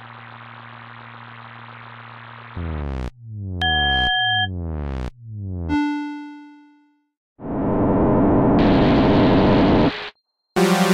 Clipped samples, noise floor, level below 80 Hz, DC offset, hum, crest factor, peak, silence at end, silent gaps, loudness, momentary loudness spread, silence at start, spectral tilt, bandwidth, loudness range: under 0.1%; -57 dBFS; -34 dBFS; under 0.1%; none; 16 dB; -6 dBFS; 0 s; 7.17-7.36 s; -19 LUFS; 23 LU; 0 s; -6 dB/octave; 16 kHz; 12 LU